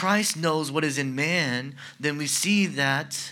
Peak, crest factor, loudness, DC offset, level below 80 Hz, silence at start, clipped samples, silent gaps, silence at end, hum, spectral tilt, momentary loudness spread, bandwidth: -8 dBFS; 18 dB; -25 LUFS; under 0.1%; -80 dBFS; 0 s; under 0.1%; none; 0 s; none; -3.5 dB/octave; 7 LU; 18 kHz